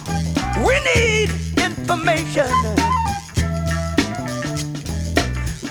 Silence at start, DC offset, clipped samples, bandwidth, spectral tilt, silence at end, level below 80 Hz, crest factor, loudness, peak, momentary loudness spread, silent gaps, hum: 0 s; under 0.1%; under 0.1%; 19.5 kHz; -4.5 dB/octave; 0 s; -30 dBFS; 16 dB; -20 LUFS; -4 dBFS; 9 LU; none; none